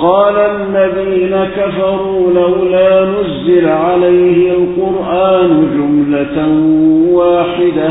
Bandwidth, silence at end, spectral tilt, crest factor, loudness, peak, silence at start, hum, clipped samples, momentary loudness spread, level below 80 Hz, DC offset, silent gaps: 4 kHz; 0 s; -12.5 dB/octave; 10 dB; -11 LUFS; 0 dBFS; 0 s; none; under 0.1%; 5 LU; -40 dBFS; under 0.1%; none